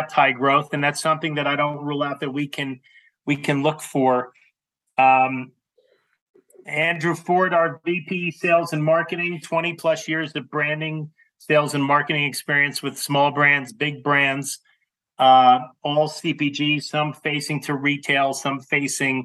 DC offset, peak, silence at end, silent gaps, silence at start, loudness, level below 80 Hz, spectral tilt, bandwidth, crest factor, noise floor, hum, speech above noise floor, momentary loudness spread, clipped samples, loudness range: under 0.1%; -4 dBFS; 0 s; 6.22-6.34 s; 0 s; -21 LUFS; -78 dBFS; -4.5 dB/octave; 12.5 kHz; 18 dB; -71 dBFS; none; 50 dB; 10 LU; under 0.1%; 5 LU